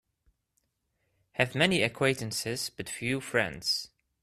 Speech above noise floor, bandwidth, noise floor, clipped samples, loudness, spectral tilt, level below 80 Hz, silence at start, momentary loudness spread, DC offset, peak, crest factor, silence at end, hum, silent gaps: 48 dB; 14.5 kHz; -78 dBFS; under 0.1%; -29 LUFS; -3.5 dB/octave; -64 dBFS; 1.35 s; 10 LU; under 0.1%; -8 dBFS; 24 dB; 0.35 s; none; none